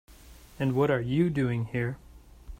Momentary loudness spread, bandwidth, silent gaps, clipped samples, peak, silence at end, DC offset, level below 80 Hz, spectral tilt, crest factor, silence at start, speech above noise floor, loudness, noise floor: 8 LU; 16 kHz; none; under 0.1%; -12 dBFS; 0.05 s; under 0.1%; -50 dBFS; -8 dB/octave; 16 dB; 0.1 s; 24 dB; -28 LUFS; -51 dBFS